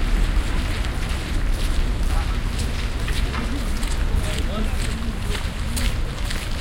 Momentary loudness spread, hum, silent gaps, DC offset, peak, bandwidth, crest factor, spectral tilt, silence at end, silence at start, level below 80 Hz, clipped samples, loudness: 2 LU; none; none; under 0.1%; -8 dBFS; 16.5 kHz; 12 dB; -4.5 dB/octave; 0 s; 0 s; -22 dBFS; under 0.1%; -26 LUFS